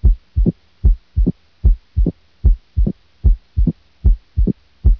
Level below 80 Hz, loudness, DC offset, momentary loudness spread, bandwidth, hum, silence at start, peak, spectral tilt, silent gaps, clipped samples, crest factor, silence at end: -16 dBFS; -20 LUFS; under 0.1%; 3 LU; 0.9 kHz; none; 0 s; -2 dBFS; -12.5 dB/octave; none; under 0.1%; 14 dB; 0 s